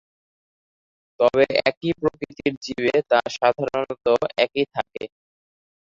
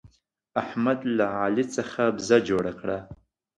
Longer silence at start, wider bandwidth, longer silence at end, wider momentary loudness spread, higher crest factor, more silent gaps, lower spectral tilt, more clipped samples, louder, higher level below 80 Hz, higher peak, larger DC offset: first, 1.2 s vs 0.05 s; second, 7.6 kHz vs 11 kHz; first, 0.9 s vs 0.45 s; second, 8 LU vs 11 LU; about the same, 22 dB vs 20 dB; first, 1.77-1.81 s, 2.57-2.61 s vs none; about the same, -5 dB/octave vs -5.5 dB/octave; neither; first, -22 LUFS vs -26 LUFS; about the same, -58 dBFS vs -58 dBFS; first, -2 dBFS vs -6 dBFS; neither